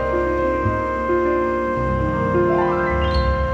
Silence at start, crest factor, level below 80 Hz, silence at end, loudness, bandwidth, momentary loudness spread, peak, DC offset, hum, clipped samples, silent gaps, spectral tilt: 0 s; 12 dB; -28 dBFS; 0 s; -20 LUFS; 7.8 kHz; 3 LU; -6 dBFS; under 0.1%; none; under 0.1%; none; -8 dB/octave